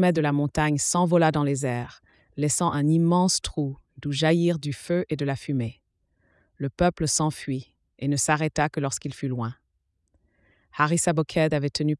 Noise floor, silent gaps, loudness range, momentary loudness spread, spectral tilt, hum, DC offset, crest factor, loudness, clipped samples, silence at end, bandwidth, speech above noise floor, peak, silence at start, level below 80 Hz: -74 dBFS; none; 4 LU; 12 LU; -5 dB/octave; none; under 0.1%; 18 dB; -25 LUFS; under 0.1%; 0.05 s; 12 kHz; 50 dB; -6 dBFS; 0 s; -50 dBFS